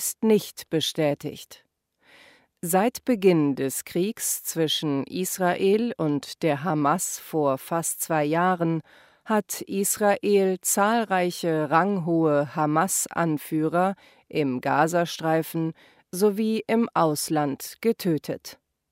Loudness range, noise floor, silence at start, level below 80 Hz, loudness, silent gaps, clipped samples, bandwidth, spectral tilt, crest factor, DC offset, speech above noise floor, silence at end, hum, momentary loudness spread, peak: 3 LU; -59 dBFS; 0 s; -70 dBFS; -24 LUFS; none; under 0.1%; 16 kHz; -4.5 dB/octave; 20 dB; under 0.1%; 35 dB; 0.4 s; none; 7 LU; -6 dBFS